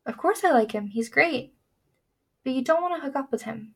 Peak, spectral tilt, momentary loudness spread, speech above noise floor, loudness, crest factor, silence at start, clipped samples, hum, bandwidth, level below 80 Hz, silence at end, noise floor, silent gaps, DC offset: -6 dBFS; -4.5 dB/octave; 10 LU; 50 dB; -25 LUFS; 22 dB; 0.05 s; under 0.1%; none; 16.5 kHz; -72 dBFS; 0.1 s; -75 dBFS; none; under 0.1%